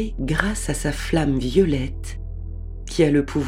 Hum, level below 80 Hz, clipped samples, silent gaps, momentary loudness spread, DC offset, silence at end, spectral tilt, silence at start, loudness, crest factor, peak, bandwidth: none; -30 dBFS; under 0.1%; none; 15 LU; under 0.1%; 0 s; -5.5 dB/octave; 0 s; -22 LUFS; 22 dB; 0 dBFS; 15.5 kHz